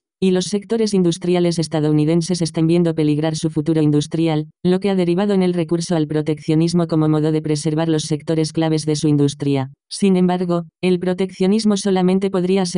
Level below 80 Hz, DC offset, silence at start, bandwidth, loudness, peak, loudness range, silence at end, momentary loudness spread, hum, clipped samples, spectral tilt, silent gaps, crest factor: -54 dBFS; under 0.1%; 0.2 s; 10.5 kHz; -18 LUFS; -6 dBFS; 1 LU; 0 s; 4 LU; none; under 0.1%; -6.5 dB/octave; none; 12 dB